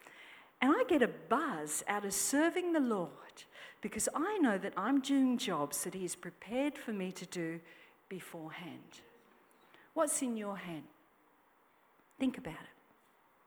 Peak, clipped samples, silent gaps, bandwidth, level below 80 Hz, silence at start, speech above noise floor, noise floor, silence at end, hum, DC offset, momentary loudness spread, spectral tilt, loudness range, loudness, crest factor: -14 dBFS; under 0.1%; none; over 20 kHz; -74 dBFS; 0.05 s; 33 dB; -69 dBFS; 0.75 s; none; under 0.1%; 18 LU; -3.5 dB/octave; 9 LU; -35 LUFS; 24 dB